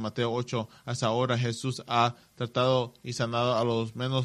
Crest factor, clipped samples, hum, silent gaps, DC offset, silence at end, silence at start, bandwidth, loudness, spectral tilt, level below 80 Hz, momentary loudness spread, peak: 20 dB; under 0.1%; none; none; under 0.1%; 0 s; 0 s; 12 kHz; -29 LUFS; -5.5 dB/octave; -66 dBFS; 8 LU; -8 dBFS